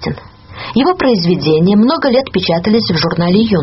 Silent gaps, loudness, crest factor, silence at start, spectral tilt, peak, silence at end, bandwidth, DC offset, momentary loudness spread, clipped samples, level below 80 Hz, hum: none; -12 LUFS; 12 dB; 0 s; -5 dB/octave; 0 dBFS; 0 s; 6 kHz; under 0.1%; 7 LU; under 0.1%; -42 dBFS; none